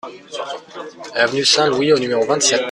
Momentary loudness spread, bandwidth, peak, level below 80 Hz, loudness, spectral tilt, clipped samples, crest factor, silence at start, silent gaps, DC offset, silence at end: 17 LU; 12.5 kHz; -2 dBFS; -60 dBFS; -15 LUFS; -2 dB/octave; under 0.1%; 16 dB; 0.05 s; none; under 0.1%; 0 s